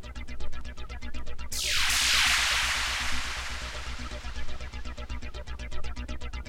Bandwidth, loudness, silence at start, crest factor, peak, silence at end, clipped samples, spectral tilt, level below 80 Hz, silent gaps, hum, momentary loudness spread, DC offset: 16.5 kHz; -27 LUFS; 0 s; 18 dB; -12 dBFS; 0 s; under 0.1%; -1 dB/octave; -36 dBFS; none; none; 19 LU; under 0.1%